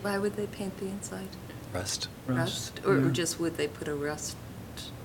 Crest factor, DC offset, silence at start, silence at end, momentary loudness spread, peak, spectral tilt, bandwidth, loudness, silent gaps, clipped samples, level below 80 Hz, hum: 20 dB; under 0.1%; 0 s; 0 s; 14 LU; -12 dBFS; -4.5 dB/octave; 18 kHz; -32 LUFS; none; under 0.1%; -56 dBFS; none